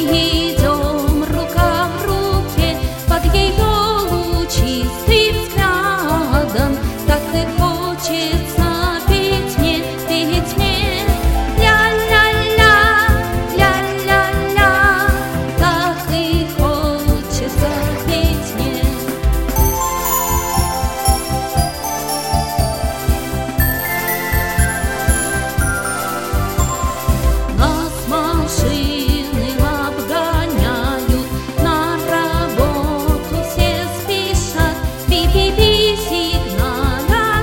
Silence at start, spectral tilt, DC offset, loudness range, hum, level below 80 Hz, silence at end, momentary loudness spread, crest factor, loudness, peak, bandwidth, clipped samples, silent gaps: 0 s; -4.5 dB/octave; under 0.1%; 5 LU; none; -20 dBFS; 0 s; 7 LU; 16 dB; -16 LUFS; 0 dBFS; 17 kHz; under 0.1%; none